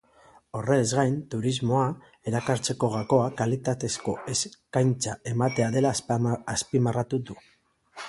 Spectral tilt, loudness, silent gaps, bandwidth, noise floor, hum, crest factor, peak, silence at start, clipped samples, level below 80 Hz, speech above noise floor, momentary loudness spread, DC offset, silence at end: -5.5 dB/octave; -27 LUFS; none; 11.5 kHz; -57 dBFS; none; 18 dB; -8 dBFS; 0.55 s; under 0.1%; -58 dBFS; 31 dB; 7 LU; under 0.1%; 0 s